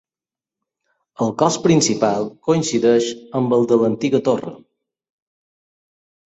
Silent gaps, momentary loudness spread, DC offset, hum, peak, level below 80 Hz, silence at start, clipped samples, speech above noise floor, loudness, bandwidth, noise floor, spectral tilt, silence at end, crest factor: none; 8 LU; under 0.1%; none; -2 dBFS; -60 dBFS; 1.2 s; under 0.1%; over 73 dB; -18 LUFS; 8.2 kHz; under -90 dBFS; -5 dB/octave; 1.75 s; 18 dB